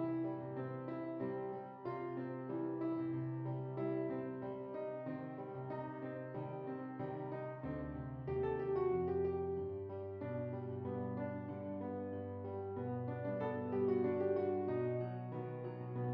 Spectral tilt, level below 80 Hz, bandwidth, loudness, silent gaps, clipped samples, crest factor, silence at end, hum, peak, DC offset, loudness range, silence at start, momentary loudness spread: -9 dB/octave; -68 dBFS; 5 kHz; -42 LUFS; none; under 0.1%; 16 dB; 0 s; none; -26 dBFS; under 0.1%; 5 LU; 0 s; 9 LU